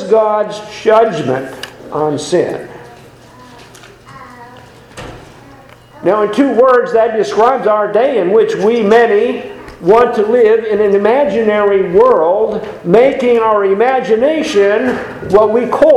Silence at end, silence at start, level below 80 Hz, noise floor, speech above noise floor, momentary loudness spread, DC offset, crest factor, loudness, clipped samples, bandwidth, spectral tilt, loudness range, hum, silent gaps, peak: 0 s; 0 s; -46 dBFS; -38 dBFS; 28 dB; 11 LU; under 0.1%; 12 dB; -11 LUFS; 0.2%; 11.5 kHz; -6 dB/octave; 10 LU; none; none; 0 dBFS